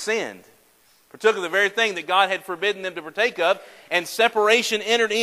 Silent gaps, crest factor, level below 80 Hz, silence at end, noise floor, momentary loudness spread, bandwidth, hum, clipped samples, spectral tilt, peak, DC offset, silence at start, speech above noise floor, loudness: none; 18 dB; -74 dBFS; 0 s; -58 dBFS; 8 LU; 16 kHz; none; under 0.1%; -1.5 dB/octave; -4 dBFS; under 0.1%; 0 s; 36 dB; -21 LUFS